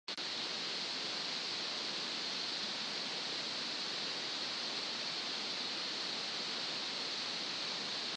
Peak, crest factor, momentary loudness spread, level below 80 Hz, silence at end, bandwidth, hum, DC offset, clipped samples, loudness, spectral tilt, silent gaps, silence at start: -26 dBFS; 14 dB; 0 LU; -88 dBFS; 0 s; 10 kHz; none; under 0.1%; under 0.1%; -37 LUFS; -1 dB/octave; none; 0.1 s